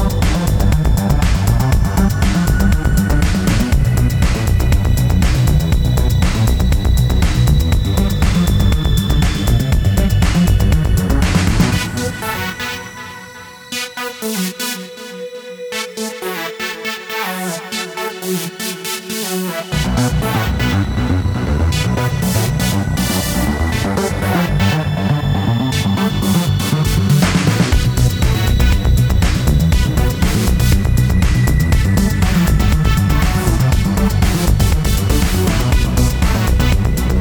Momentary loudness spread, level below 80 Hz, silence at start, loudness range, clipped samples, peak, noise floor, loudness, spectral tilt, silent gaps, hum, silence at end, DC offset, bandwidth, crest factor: 8 LU; -18 dBFS; 0 s; 8 LU; under 0.1%; -2 dBFS; -34 dBFS; -16 LUFS; -5.5 dB/octave; none; none; 0 s; under 0.1%; over 20 kHz; 12 dB